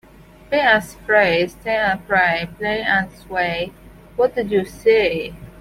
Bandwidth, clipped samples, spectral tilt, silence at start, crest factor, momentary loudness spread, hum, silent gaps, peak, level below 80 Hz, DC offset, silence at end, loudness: 16 kHz; under 0.1%; -5 dB/octave; 0.5 s; 16 dB; 10 LU; none; none; -2 dBFS; -46 dBFS; under 0.1%; 0.1 s; -18 LUFS